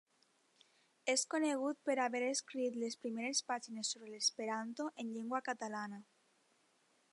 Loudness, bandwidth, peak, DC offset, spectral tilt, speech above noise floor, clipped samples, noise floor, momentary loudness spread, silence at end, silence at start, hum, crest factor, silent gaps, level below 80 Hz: -39 LUFS; 11.5 kHz; -22 dBFS; under 0.1%; -1.5 dB/octave; 36 dB; under 0.1%; -75 dBFS; 8 LU; 1.1 s; 1.05 s; none; 20 dB; none; under -90 dBFS